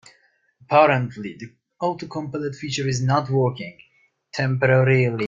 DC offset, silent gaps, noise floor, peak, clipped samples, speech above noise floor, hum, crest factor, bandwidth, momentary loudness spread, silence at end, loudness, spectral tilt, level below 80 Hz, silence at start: under 0.1%; none; -61 dBFS; -2 dBFS; under 0.1%; 41 dB; none; 20 dB; 7.6 kHz; 18 LU; 0 s; -21 LUFS; -6 dB/octave; -58 dBFS; 0.7 s